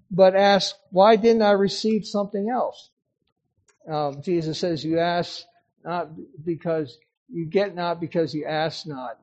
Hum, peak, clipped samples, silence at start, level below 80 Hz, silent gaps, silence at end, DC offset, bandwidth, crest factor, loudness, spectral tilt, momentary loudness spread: none; -4 dBFS; under 0.1%; 0.1 s; -64 dBFS; 2.92-2.97 s, 3.32-3.36 s, 7.17-7.26 s; 0.1 s; under 0.1%; 8.4 kHz; 20 dB; -22 LUFS; -5.5 dB/octave; 16 LU